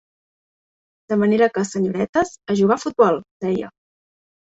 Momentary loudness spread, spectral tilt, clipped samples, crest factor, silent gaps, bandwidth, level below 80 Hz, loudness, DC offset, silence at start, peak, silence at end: 7 LU; -6 dB/octave; under 0.1%; 18 dB; 2.09-2.13 s, 3.31-3.40 s; 8 kHz; -60 dBFS; -20 LUFS; under 0.1%; 1.1 s; -2 dBFS; 0.85 s